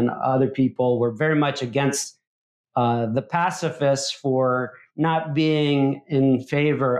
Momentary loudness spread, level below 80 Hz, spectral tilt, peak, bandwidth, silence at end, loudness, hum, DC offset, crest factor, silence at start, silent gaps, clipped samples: 4 LU; -68 dBFS; -5.5 dB/octave; -8 dBFS; 13.5 kHz; 0 s; -22 LUFS; none; under 0.1%; 14 dB; 0 s; 2.27-2.64 s; under 0.1%